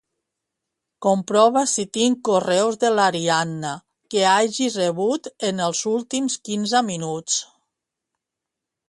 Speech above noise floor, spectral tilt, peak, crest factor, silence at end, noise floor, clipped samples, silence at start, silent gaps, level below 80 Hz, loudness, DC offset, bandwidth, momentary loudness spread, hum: 64 dB; -3.5 dB/octave; -4 dBFS; 18 dB; 1.45 s; -85 dBFS; under 0.1%; 1 s; none; -68 dBFS; -21 LUFS; under 0.1%; 11.5 kHz; 9 LU; none